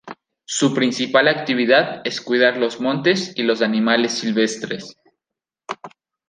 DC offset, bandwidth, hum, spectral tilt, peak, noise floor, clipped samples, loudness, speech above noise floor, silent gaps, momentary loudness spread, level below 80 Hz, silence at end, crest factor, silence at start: under 0.1%; 9.8 kHz; none; -4 dB/octave; 0 dBFS; -86 dBFS; under 0.1%; -18 LUFS; 68 dB; none; 17 LU; -68 dBFS; 0.4 s; 18 dB; 0.05 s